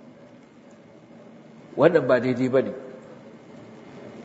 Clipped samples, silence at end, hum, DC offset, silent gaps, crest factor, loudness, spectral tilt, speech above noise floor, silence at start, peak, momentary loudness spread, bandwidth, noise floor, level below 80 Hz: under 0.1%; 0 s; none; under 0.1%; none; 24 dB; -22 LUFS; -7.5 dB/octave; 29 dB; 1.75 s; -4 dBFS; 26 LU; 8 kHz; -49 dBFS; -72 dBFS